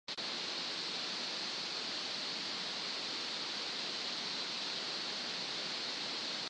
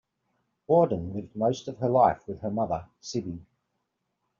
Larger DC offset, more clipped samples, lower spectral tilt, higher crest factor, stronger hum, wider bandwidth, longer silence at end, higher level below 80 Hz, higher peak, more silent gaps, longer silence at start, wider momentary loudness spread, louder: neither; neither; second, -1 dB/octave vs -7 dB/octave; second, 14 dB vs 20 dB; neither; first, 10 kHz vs 7.4 kHz; second, 0 s vs 1 s; second, -90 dBFS vs -60 dBFS; second, -26 dBFS vs -8 dBFS; neither; second, 0.1 s vs 0.7 s; second, 0 LU vs 12 LU; second, -37 LUFS vs -27 LUFS